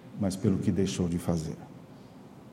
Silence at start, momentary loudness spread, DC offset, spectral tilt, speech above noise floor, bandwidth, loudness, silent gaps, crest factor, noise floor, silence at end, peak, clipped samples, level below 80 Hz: 0 s; 22 LU; under 0.1%; -6.5 dB/octave; 21 dB; 15 kHz; -30 LUFS; none; 18 dB; -49 dBFS; 0 s; -12 dBFS; under 0.1%; -54 dBFS